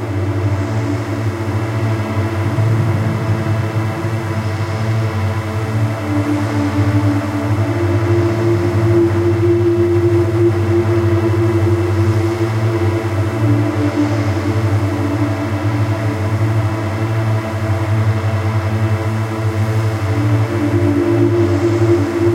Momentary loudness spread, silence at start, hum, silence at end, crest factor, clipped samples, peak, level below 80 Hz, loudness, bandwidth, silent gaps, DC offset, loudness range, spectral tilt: 5 LU; 0 s; none; 0 s; 12 dB; under 0.1%; -2 dBFS; -46 dBFS; -16 LUFS; 13 kHz; none; under 0.1%; 4 LU; -8 dB/octave